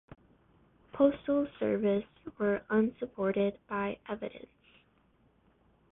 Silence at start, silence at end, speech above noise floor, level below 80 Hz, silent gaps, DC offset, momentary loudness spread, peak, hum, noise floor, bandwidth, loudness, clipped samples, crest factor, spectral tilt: 0.95 s; 1.55 s; 37 dB; -64 dBFS; none; under 0.1%; 13 LU; -14 dBFS; none; -68 dBFS; 3.9 kHz; -32 LUFS; under 0.1%; 20 dB; -10.5 dB/octave